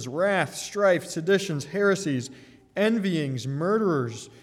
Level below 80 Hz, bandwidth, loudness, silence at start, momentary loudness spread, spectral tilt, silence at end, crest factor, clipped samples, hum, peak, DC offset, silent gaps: -70 dBFS; 15 kHz; -25 LUFS; 0 s; 7 LU; -5.5 dB/octave; 0.15 s; 16 dB; under 0.1%; none; -10 dBFS; under 0.1%; none